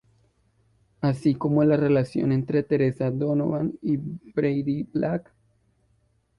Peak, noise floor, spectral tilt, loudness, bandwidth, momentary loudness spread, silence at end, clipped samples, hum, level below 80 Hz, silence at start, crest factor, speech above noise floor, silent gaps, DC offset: -10 dBFS; -66 dBFS; -9.5 dB/octave; -24 LUFS; 11 kHz; 7 LU; 1.15 s; under 0.1%; none; -58 dBFS; 1 s; 16 dB; 43 dB; none; under 0.1%